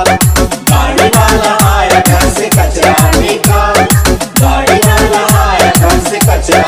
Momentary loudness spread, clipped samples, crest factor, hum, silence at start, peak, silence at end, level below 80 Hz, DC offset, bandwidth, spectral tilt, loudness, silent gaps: 3 LU; 0.4%; 8 dB; none; 0 s; 0 dBFS; 0 s; -16 dBFS; under 0.1%; 16.5 kHz; -4.5 dB/octave; -8 LUFS; none